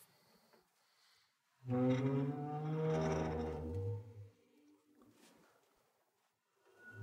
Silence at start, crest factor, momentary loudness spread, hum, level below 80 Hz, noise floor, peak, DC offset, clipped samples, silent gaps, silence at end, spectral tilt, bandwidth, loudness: 0 s; 16 dB; 20 LU; none; -64 dBFS; -82 dBFS; -26 dBFS; under 0.1%; under 0.1%; none; 0 s; -8 dB/octave; 13 kHz; -39 LUFS